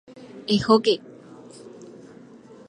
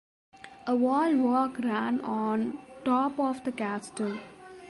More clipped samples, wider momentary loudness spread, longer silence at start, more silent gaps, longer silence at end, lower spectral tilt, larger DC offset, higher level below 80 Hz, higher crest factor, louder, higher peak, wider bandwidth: neither; first, 26 LU vs 10 LU; second, 0.15 s vs 0.45 s; neither; first, 0.8 s vs 0 s; about the same, -5.5 dB/octave vs -6 dB/octave; neither; first, -58 dBFS vs -70 dBFS; first, 22 dB vs 14 dB; first, -21 LUFS vs -29 LUFS; first, -2 dBFS vs -16 dBFS; about the same, 11 kHz vs 11.5 kHz